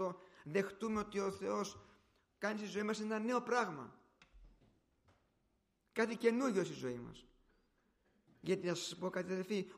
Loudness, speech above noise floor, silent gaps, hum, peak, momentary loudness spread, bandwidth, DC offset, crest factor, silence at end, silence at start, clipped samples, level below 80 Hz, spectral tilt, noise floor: -40 LUFS; 41 dB; none; none; -20 dBFS; 13 LU; 15 kHz; under 0.1%; 22 dB; 0 s; 0 s; under 0.1%; -72 dBFS; -5 dB/octave; -80 dBFS